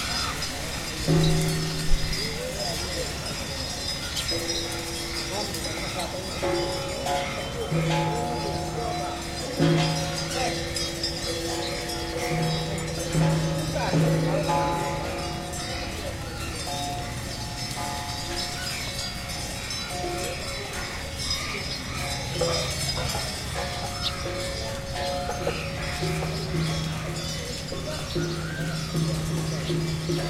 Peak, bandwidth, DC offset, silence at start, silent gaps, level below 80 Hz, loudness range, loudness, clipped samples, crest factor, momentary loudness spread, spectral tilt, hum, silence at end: -8 dBFS; 16.5 kHz; under 0.1%; 0 s; none; -38 dBFS; 4 LU; -28 LUFS; under 0.1%; 20 dB; 7 LU; -4 dB/octave; none; 0 s